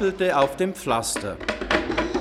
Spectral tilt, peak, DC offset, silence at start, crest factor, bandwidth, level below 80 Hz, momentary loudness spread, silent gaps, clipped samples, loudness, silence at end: -4 dB/octave; -6 dBFS; under 0.1%; 0 s; 18 dB; 16 kHz; -42 dBFS; 7 LU; none; under 0.1%; -24 LUFS; 0 s